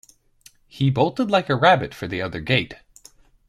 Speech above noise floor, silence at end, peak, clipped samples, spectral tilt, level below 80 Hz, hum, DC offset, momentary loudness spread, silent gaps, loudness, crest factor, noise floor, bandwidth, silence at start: 34 dB; 0.75 s; -2 dBFS; under 0.1%; -6.5 dB/octave; -52 dBFS; none; under 0.1%; 11 LU; none; -21 LUFS; 20 dB; -54 dBFS; 13 kHz; 0.75 s